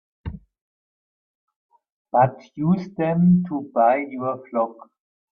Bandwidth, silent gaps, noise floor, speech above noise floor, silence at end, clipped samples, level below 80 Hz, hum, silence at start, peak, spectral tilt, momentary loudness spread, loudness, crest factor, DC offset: 5.2 kHz; 0.61-1.48 s, 1.56-1.69 s, 1.92-2.05 s; under -90 dBFS; over 70 dB; 0.6 s; under 0.1%; -52 dBFS; none; 0.25 s; -4 dBFS; -11 dB/octave; 11 LU; -21 LUFS; 18 dB; under 0.1%